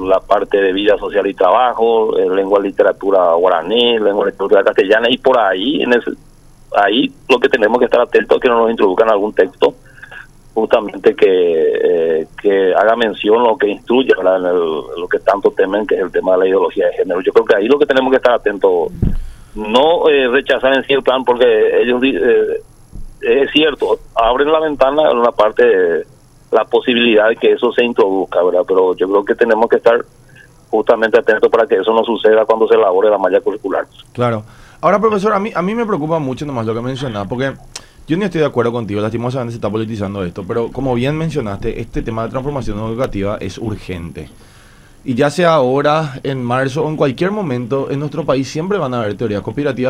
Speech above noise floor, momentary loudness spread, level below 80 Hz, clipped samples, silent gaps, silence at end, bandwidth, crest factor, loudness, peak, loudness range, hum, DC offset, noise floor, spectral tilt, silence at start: 29 dB; 10 LU; -36 dBFS; under 0.1%; none; 0 s; 11.5 kHz; 14 dB; -14 LUFS; 0 dBFS; 6 LU; none; under 0.1%; -43 dBFS; -6 dB/octave; 0 s